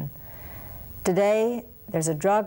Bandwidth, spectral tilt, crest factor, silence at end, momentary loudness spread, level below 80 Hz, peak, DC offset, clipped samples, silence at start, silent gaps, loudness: 17 kHz; -5.5 dB/octave; 14 dB; 0 s; 17 LU; -50 dBFS; -12 dBFS; under 0.1%; under 0.1%; 0 s; none; -25 LUFS